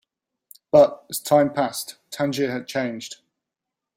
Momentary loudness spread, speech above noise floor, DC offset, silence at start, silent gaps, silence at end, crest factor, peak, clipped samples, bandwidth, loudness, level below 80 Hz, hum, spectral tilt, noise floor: 16 LU; 64 dB; under 0.1%; 0.75 s; none; 0.8 s; 20 dB; -2 dBFS; under 0.1%; 16 kHz; -22 LUFS; -62 dBFS; none; -4.5 dB/octave; -85 dBFS